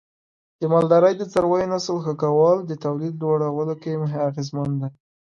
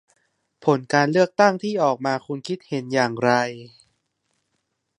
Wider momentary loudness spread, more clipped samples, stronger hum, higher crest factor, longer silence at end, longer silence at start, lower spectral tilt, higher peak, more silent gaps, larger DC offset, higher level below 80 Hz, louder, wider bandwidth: about the same, 10 LU vs 11 LU; neither; neither; about the same, 18 dB vs 22 dB; second, 0.4 s vs 1.3 s; about the same, 0.6 s vs 0.6 s; first, -7.5 dB/octave vs -5.5 dB/octave; about the same, -4 dBFS vs -2 dBFS; neither; neither; first, -60 dBFS vs -72 dBFS; about the same, -21 LUFS vs -21 LUFS; about the same, 10.5 kHz vs 11 kHz